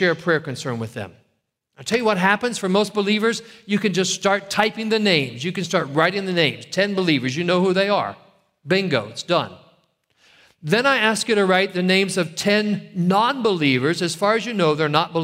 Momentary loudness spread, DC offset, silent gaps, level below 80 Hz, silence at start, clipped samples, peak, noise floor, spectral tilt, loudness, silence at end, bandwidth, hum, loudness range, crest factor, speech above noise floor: 8 LU; under 0.1%; none; -64 dBFS; 0 s; under 0.1%; -2 dBFS; -71 dBFS; -4.5 dB/octave; -20 LUFS; 0 s; 16 kHz; none; 3 LU; 20 dB; 51 dB